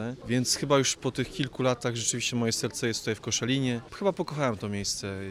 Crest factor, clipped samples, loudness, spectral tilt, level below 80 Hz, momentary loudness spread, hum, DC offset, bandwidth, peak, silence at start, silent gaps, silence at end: 18 dB; under 0.1%; -28 LUFS; -4 dB/octave; -58 dBFS; 7 LU; none; under 0.1%; 16 kHz; -12 dBFS; 0 s; none; 0 s